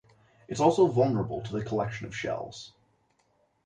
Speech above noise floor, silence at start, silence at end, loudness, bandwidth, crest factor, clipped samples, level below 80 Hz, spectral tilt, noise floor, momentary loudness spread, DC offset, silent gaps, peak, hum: 43 dB; 0.5 s; 0.95 s; -28 LUFS; 9.8 kHz; 20 dB; under 0.1%; -60 dBFS; -6.5 dB/octave; -70 dBFS; 18 LU; under 0.1%; none; -10 dBFS; none